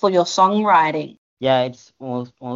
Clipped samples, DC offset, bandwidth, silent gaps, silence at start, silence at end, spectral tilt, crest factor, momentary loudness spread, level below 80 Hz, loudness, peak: under 0.1%; under 0.1%; 7.8 kHz; 1.18-1.37 s; 0 s; 0 s; -5 dB/octave; 16 dB; 14 LU; -66 dBFS; -18 LUFS; -4 dBFS